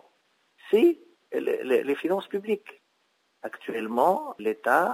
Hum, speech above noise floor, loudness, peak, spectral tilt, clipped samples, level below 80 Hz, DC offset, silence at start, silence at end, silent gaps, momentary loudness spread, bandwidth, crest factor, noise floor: none; 45 dB; -26 LUFS; -6 dBFS; -5.5 dB/octave; under 0.1%; -84 dBFS; under 0.1%; 0.65 s; 0 s; none; 14 LU; 16 kHz; 20 dB; -71 dBFS